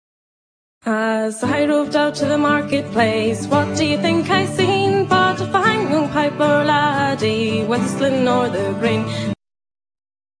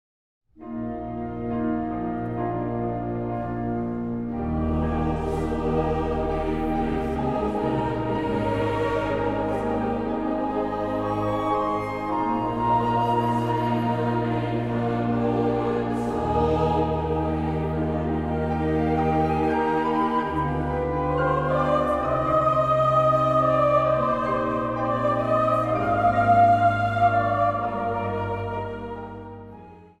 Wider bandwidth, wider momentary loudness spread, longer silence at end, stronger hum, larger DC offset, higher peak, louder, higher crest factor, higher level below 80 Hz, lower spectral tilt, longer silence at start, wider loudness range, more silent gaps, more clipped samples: second, 10.5 kHz vs 12 kHz; second, 5 LU vs 9 LU; first, 1.05 s vs 0.15 s; neither; neither; first, -2 dBFS vs -8 dBFS; first, -18 LUFS vs -24 LUFS; about the same, 16 dB vs 16 dB; second, -54 dBFS vs -40 dBFS; second, -5.5 dB/octave vs -8.5 dB/octave; first, 0.85 s vs 0.6 s; second, 3 LU vs 6 LU; neither; neither